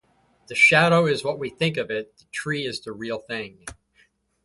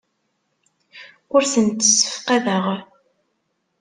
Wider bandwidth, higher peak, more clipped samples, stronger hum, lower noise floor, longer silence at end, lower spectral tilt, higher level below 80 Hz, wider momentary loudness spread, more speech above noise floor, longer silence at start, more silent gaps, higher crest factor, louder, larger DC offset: about the same, 11.5 kHz vs 11 kHz; about the same, -2 dBFS vs -2 dBFS; neither; neither; second, -63 dBFS vs -72 dBFS; second, 0.7 s vs 0.95 s; first, -4.5 dB/octave vs -2.5 dB/octave; first, -60 dBFS vs -66 dBFS; first, 18 LU vs 9 LU; second, 40 dB vs 53 dB; second, 0.5 s vs 0.95 s; neither; about the same, 22 dB vs 20 dB; second, -22 LUFS vs -17 LUFS; neither